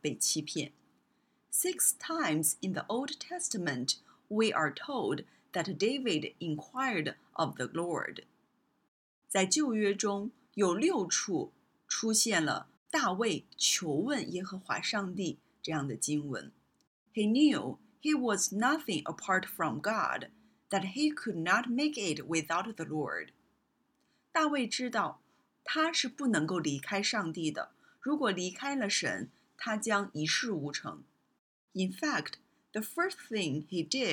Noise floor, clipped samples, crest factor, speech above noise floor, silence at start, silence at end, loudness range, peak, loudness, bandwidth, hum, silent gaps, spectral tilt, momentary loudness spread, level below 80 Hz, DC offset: -76 dBFS; under 0.1%; 20 dB; 43 dB; 0.05 s; 0 s; 4 LU; -12 dBFS; -32 LUFS; 18 kHz; none; 8.88-9.22 s, 12.77-12.86 s, 16.87-17.06 s, 31.39-31.68 s; -3 dB/octave; 11 LU; -78 dBFS; under 0.1%